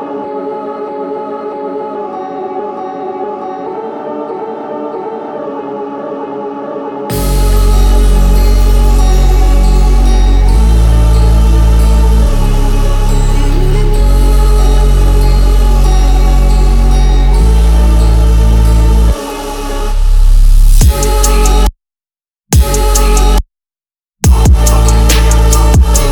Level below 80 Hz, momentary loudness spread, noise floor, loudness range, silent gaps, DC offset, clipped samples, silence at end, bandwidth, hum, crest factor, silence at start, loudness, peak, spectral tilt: -8 dBFS; 11 LU; under -90 dBFS; 10 LU; none; under 0.1%; under 0.1%; 0 s; 18.5 kHz; none; 8 dB; 0 s; -12 LUFS; 0 dBFS; -5.5 dB/octave